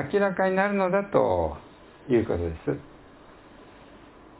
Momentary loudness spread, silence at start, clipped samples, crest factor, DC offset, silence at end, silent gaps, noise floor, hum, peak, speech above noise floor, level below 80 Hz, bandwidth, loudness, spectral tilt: 10 LU; 0 s; under 0.1%; 20 dB; under 0.1%; 0.35 s; none; -50 dBFS; none; -8 dBFS; 25 dB; -46 dBFS; 4 kHz; -25 LUFS; -11 dB/octave